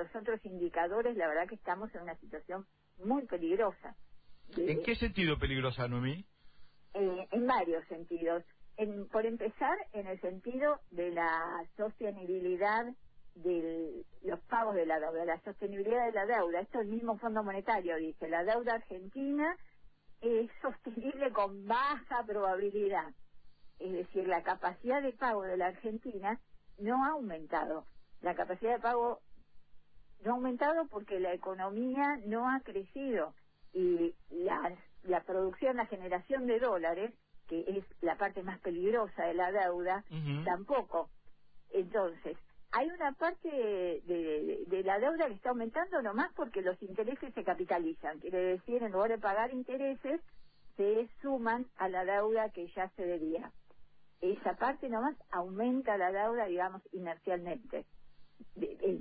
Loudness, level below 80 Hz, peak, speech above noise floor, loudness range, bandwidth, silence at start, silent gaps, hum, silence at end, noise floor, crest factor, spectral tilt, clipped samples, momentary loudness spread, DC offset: -36 LUFS; -60 dBFS; -18 dBFS; 23 dB; 2 LU; 4.8 kHz; 0 s; none; none; 0 s; -58 dBFS; 18 dB; -4.5 dB/octave; under 0.1%; 9 LU; under 0.1%